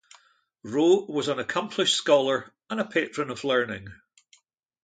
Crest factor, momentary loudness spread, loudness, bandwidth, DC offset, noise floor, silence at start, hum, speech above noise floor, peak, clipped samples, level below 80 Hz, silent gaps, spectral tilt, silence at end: 20 dB; 11 LU; -25 LUFS; 9.4 kHz; under 0.1%; -63 dBFS; 0.65 s; none; 38 dB; -6 dBFS; under 0.1%; -66 dBFS; none; -3.5 dB/octave; 0.9 s